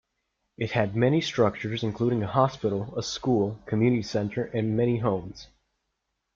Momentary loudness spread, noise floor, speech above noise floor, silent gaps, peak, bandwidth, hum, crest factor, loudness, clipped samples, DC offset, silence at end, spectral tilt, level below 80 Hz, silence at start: 7 LU; -80 dBFS; 54 dB; none; -8 dBFS; 7.6 kHz; none; 20 dB; -26 LUFS; under 0.1%; under 0.1%; 0.9 s; -6.5 dB/octave; -58 dBFS; 0.6 s